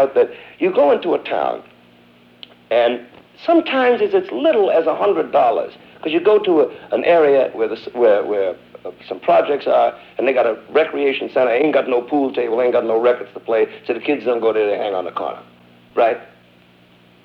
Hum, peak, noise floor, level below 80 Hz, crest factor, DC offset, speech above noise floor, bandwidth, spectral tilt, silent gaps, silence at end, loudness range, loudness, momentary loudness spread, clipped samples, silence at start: 60 Hz at -50 dBFS; -2 dBFS; -50 dBFS; -64 dBFS; 14 dB; under 0.1%; 33 dB; 5.6 kHz; -7 dB/octave; none; 1 s; 4 LU; -17 LUFS; 10 LU; under 0.1%; 0 s